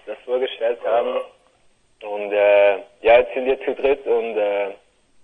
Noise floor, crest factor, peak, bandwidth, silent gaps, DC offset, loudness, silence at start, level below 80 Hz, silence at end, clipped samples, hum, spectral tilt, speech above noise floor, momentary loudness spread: -59 dBFS; 18 dB; -2 dBFS; 4 kHz; none; under 0.1%; -20 LUFS; 0.05 s; -54 dBFS; 0.5 s; under 0.1%; none; -5.5 dB/octave; 38 dB; 14 LU